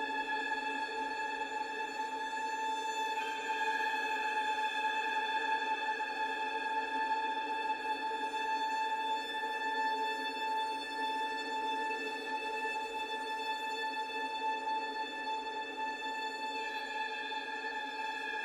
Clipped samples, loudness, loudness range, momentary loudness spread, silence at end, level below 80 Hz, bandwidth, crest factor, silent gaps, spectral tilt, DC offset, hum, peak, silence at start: under 0.1%; -36 LUFS; 3 LU; 4 LU; 0 s; -76 dBFS; 15 kHz; 16 dB; none; -0.5 dB/octave; under 0.1%; none; -22 dBFS; 0 s